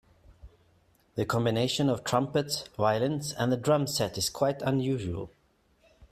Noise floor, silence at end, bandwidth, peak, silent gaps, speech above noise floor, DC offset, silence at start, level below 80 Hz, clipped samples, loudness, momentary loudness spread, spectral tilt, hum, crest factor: -67 dBFS; 0.05 s; 15.5 kHz; -10 dBFS; none; 39 dB; under 0.1%; 0.45 s; -58 dBFS; under 0.1%; -29 LUFS; 8 LU; -5 dB/octave; none; 18 dB